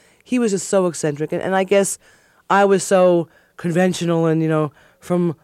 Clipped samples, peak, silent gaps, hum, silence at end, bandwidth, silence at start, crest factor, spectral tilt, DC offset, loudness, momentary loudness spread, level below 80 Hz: under 0.1%; -4 dBFS; none; none; 0.1 s; 15.5 kHz; 0.3 s; 16 dB; -5.5 dB/octave; under 0.1%; -18 LUFS; 9 LU; -64 dBFS